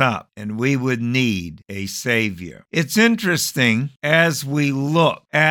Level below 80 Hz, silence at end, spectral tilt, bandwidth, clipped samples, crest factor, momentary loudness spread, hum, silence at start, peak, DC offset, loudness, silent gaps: -56 dBFS; 0 s; -4.5 dB/octave; 19 kHz; under 0.1%; 18 dB; 11 LU; none; 0 s; -2 dBFS; under 0.1%; -19 LUFS; none